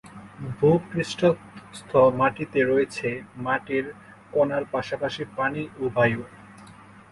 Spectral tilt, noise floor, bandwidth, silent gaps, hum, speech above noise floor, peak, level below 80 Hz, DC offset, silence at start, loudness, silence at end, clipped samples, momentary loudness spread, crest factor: -6.5 dB/octave; -48 dBFS; 11.5 kHz; none; none; 24 dB; -6 dBFS; -56 dBFS; under 0.1%; 0.05 s; -24 LUFS; 0.4 s; under 0.1%; 16 LU; 18 dB